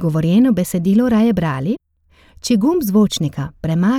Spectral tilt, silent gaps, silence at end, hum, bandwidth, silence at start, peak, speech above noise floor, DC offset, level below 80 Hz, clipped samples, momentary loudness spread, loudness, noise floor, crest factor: -6.5 dB/octave; none; 0 s; none; 16 kHz; 0 s; -4 dBFS; 37 dB; under 0.1%; -44 dBFS; under 0.1%; 9 LU; -16 LUFS; -52 dBFS; 12 dB